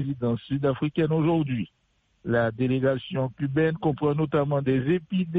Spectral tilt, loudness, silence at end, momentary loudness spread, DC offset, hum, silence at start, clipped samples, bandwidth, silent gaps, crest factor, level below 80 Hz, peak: -10.5 dB/octave; -25 LUFS; 0 s; 5 LU; under 0.1%; none; 0 s; under 0.1%; 4.6 kHz; none; 14 dB; -56 dBFS; -12 dBFS